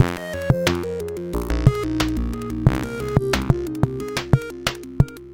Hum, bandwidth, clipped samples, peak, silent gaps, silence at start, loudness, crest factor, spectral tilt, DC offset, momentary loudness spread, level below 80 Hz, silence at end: none; 17 kHz; under 0.1%; 0 dBFS; none; 0 s; -23 LUFS; 22 dB; -6 dB/octave; under 0.1%; 7 LU; -30 dBFS; 0 s